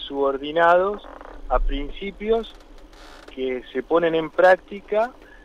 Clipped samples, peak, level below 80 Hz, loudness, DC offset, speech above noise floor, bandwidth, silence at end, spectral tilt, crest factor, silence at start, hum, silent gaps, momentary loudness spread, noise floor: under 0.1%; -6 dBFS; -34 dBFS; -22 LUFS; under 0.1%; 22 dB; 9.2 kHz; 0.35 s; -6 dB/octave; 16 dB; 0 s; none; none; 17 LU; -44 dBFS